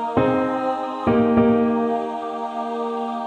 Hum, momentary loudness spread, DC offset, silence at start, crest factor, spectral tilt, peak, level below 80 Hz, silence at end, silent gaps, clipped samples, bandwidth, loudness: none; 10 LU; under 0.1%; 0 s; 16 dB; -8 dB/octave; -4 dBFS; -50 dBFS; 0 s; none; under 0.1%; 8 kHz; -21 LUFS